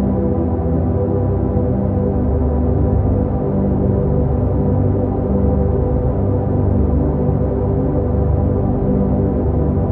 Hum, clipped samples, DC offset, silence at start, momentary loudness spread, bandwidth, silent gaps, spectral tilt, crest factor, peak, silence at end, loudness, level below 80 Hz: none; under 0.1%; under 0.1%; 0 s; 2 LU; 2.6 kHz; none; -14.5 dB/octave; 12 dB; -4 dBFS; 0 s; -17 LUFS; -22 dBFS